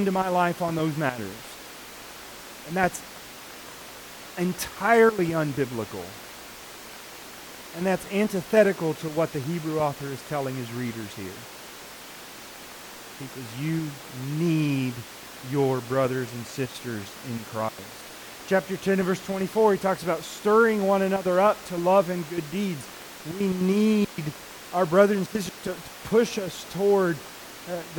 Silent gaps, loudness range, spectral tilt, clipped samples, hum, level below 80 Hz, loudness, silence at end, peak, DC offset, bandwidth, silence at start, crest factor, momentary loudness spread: none; 9 LU; -5.5 dB/octave; under 0.1%; none; -60 dBFS; -26 LUFS; 0 s; -6 dBFS; under 0.1%; 19 kHz; 0 s; 20 dB; 19 LU